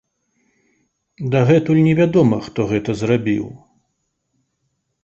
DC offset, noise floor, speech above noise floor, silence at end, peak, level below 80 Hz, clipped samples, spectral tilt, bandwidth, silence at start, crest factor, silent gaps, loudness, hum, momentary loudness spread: under 0.1%; -72 dBFS; 56 dB; 1.5 s; -2 dBFS; -52 dBFS; under 0.1%; -8 dB/octave; 8 kHz; 1.2 s; 18 dB; none; -17 LUFS; none; 9 LU